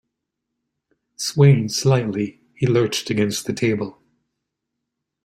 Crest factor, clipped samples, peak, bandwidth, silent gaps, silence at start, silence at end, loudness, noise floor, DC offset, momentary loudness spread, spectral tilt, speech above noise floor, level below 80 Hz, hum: 20 dB; under 0.1%; -2 dBFS; 14.5 kHz; none; 1.2 s; 1.35 s; -20 LUFS; -80 dBFS; under 0.1%; 12 LU; -5.5 dB/octave; 62 dB; -56 dBFS; none